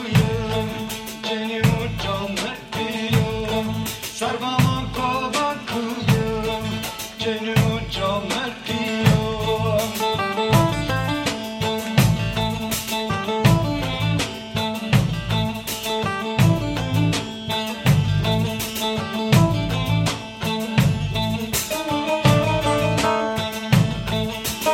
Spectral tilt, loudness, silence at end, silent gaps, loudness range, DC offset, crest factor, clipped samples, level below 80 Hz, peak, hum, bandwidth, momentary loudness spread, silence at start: -5 dB/octave; -22 LUFS; 0 s; none; 2 LU; under 0.1%; 20 dB; under 0.1%; -38 dBFS; -2 dBFS; none; 17 kHz; 7 LU; 0 s